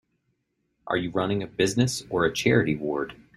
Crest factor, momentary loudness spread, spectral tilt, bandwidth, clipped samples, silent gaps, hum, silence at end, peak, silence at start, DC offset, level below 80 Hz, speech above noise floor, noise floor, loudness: 20 dB; 7 LU; -5 dB/octave; 14 kHz; under 0.1%; none; none; 0.2 s; -8 dBFS; 0.85 s; under 0.1%; -56 dBFS; 50 dB; -75 dBFS; -25 LUFS